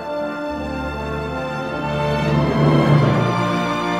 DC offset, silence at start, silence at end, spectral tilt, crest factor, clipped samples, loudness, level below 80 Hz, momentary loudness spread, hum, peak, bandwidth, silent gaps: under 0.1%; 0 s; 0 s; -7.5 dB/octave; 16 dB; under 0.1%; -19 LUFS; -36 dBFS; 10 LU; none; -2 dBFS; 10 kHz; none